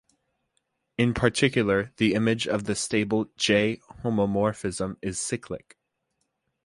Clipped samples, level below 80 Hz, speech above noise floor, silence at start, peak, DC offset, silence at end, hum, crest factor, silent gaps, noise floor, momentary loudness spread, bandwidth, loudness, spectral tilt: under 0.1%; -52 dBFS; 52 dB; 1 s; -6 dBFS; under 0.1%; 1.1 s; none; 22 dB; none; -77 dBFS; 9 LU; 11.5 kHz; -25 LUFS; -4.5 dB/octave